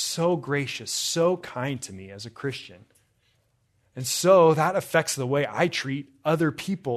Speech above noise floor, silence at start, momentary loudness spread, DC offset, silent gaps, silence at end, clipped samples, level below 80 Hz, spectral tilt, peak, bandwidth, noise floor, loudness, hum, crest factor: 44 dB; 0 s; 16 LU; under 0.1%; none; 0 s; under 0.1%; -68 dBFS; -4.5 dB/octave; -6 dBFS; 14 kHz; -68 dBFS; -24 LUFS; none; 20 dB